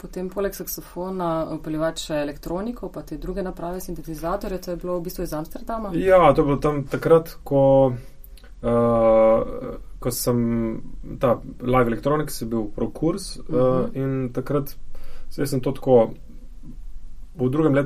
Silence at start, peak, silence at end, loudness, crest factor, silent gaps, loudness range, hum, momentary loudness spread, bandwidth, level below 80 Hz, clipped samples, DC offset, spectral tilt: 0.05 s; -2 dBFS; 0 s; -22 LUFS; 20 dB; none; 9 LU; none; 14 LU; 15.5 kHz; -38 dBFS; under 0.1%; under 0.1%; -6.5 dB/octave